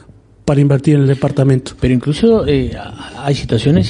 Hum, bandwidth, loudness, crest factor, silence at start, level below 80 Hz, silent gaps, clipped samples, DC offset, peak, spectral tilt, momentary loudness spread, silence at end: none; 10.5 kHz; -14 LUFS; 14 dB; 0.45 s; -34 dBFS; none; under 0.1%; under 0.1%; 0 dBFS; -7.5 dB/octave; 11 LU; 0 s